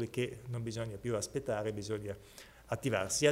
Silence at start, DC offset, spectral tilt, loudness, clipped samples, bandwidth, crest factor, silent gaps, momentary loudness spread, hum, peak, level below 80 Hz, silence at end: 0 s; under 0.1%; -4.5 dB/octave; -37 LUFS; under 0.1%; 16 kHz; 22 dB; none; 12 LU; none; -14 dBFS; -62 dBFS; 0 s